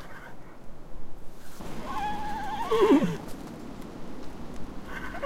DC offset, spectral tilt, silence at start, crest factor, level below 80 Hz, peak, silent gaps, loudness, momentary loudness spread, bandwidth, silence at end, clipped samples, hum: under 0.1%; -6 dB/octave; 0 s; 18 dB; -44 dBFS; -10 dBFS; none; -28 LUFS; 26 LU; 16 kHz; 0 s; under 0.1%; none